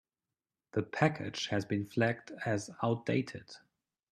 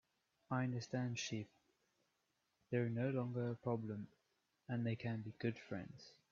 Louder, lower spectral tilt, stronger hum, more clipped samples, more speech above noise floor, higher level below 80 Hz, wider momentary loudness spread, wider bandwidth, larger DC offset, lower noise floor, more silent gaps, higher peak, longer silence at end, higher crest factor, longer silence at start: first, -34 LUFS vs -43 LUFS; about the same, -6 dB/octave vs -6.5 dB/octave; neither; neither; first, over 56 dB vs 43 dB; first, -72 dBFS vs -80 dBFS; about the same, 11 LU vs 12 LU; first, 12.5 kHz vs 7.2 kHz; neither; first, under -90 dBFS vs -85 dBFS; neither; first, -12 dBFS vs -26 dBFS; first, 0.55 s vs 0.2 s; about the same, 24 dB vs 20 dB; first, 0.75 s vs 0.5 s